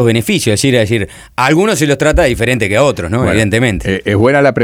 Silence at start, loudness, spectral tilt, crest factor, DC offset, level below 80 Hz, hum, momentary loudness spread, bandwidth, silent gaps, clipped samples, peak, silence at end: 0 s; -12 LUFS; -5 dB/octave; 12 dB; under 0.1%; -28 dBFS; none; 5 LU; 19 kHz; none; under 0.1%; 0 dBFS; 0 s